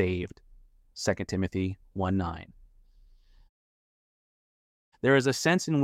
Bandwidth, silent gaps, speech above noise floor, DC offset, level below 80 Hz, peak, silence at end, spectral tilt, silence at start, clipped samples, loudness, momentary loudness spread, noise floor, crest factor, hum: 15.5 kHz; 3.49-4.92 s; 30 dB; under 0.1%; -54 dBFS; -10 dBFS; 0 s; -5.5 dB/octave; 0 s; under 0.1%; -28 LUFS; 14 LU; -58 dBFS; 20 dB; none